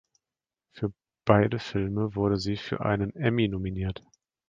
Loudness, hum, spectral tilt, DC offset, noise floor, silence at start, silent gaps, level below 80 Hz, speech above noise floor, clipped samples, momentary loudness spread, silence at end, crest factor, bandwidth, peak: -28 LUFS; none; -7.5 dB/octave; under 0.1%; under -90 dBFS; 0.75 s; none; -48 dBFS; over 63 dB; under 0.1%; 12 LU; 0.5 s; 24 dB; 7.6 kHz; -4 dBFS